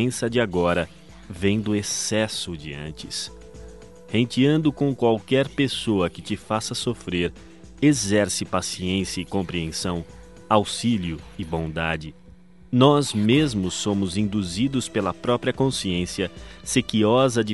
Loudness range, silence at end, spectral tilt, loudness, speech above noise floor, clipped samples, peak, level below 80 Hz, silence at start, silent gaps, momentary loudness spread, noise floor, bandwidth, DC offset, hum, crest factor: 4 LU; 0 s; -5 dB/octave; -23 LUFS; 26 dB; under 0.1%; -2 dBFS; -48 dBFS; 0 s; none; 12 LU; -49 dBFS; 11.5 kHz; 0.3%; none; 22 dB